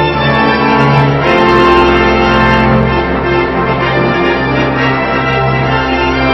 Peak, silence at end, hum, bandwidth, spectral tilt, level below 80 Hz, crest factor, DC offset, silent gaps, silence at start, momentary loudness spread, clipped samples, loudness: 0 dBFS; 0 s; none; 7.4 kHz; -7 dB/octave; -24 dBFS; 10 dB; under 0.1%; none; 0 s; 5 LU; 0.4%; -10 LUFS